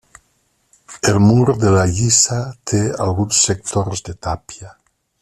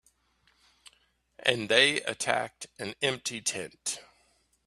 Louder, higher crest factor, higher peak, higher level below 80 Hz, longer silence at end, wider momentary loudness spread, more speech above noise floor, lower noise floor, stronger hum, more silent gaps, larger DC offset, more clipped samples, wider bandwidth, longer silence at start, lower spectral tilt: first, -16 LUFS vs -28 LUFS; second, 16 dB vs 28 dB; first, 0 dBFS vs -4 dBFS; first, -44 dBFS vs -70 dBFS; about the same, 0.55 s vs 0.65 s; second, 13 LU vs 17 LU; first, 47 dB vs 40 dB; second, -63 dBFS vs -69 dBFS; neither; neither; neither; neither; second, 13 kHz vs 14.5 kHz; second, 0.9 s vs 1.4 s; first, -4.5 dB/octave vs -1.5 dB/octave